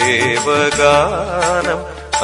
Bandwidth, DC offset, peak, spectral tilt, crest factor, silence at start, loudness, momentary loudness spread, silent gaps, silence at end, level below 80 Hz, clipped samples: 11 kHz; under 0.1%; 0 dBFS; -3 dB/octave; 14 dB; 0 s; -14 LUFS; 9 LU; none; 0 s; -38 dBFS; under 0.1%